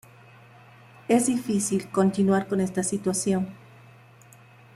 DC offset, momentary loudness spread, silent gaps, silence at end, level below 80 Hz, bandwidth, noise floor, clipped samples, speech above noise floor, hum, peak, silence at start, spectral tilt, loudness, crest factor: under 0.1%; 5 LU; none; 1.2 s; -66 dBFS; 14.5 kHz; -52 dBFS; under 0.1%; 28 dB; none; -10 dBFS; 1.1 s; -5.5 dB/octave; -25 LUFS; 18 dB